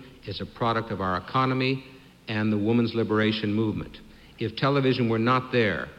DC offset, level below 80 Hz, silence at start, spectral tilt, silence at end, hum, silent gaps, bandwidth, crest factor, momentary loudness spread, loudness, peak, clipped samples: under 0.1%; -54 dBFS; 0 s; -8 dB/octave; 0.05 s; none; none; 8.8 kHz; 16 dB; 12 LU; -26 LUFS; -10 dBFS; under 0.1%